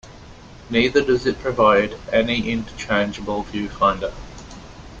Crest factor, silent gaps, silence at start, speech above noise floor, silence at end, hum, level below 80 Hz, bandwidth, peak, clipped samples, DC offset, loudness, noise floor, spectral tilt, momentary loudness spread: 18 dB; none; 0.05 s; 22 dB; 0 s; none; -42 dBFS; 8.6 kHz; -2 dBFS; under 0.1%; under 0.1%; -20 LUFS; -41 dBFS; -5.5 dB/octave; 22 LU